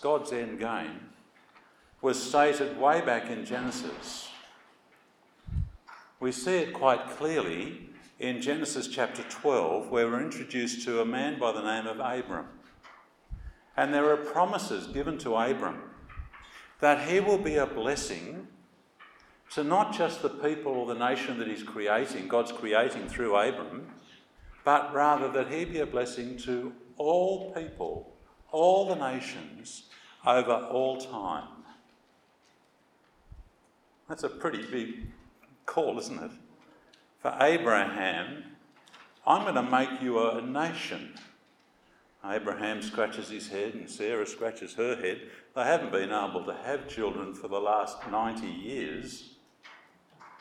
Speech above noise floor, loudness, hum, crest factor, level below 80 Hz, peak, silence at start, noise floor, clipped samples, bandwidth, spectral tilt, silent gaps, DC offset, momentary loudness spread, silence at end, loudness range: 36 dB; -30 LUFS; none; 24 dB; -56 dBFS; -8 dBFS; 0 s; -66 dBFS; under 0.1%; 14.5 kHz; -4.5 dB/octave; none; under 0.1%; 16 LU; 0.05 s; 7 LU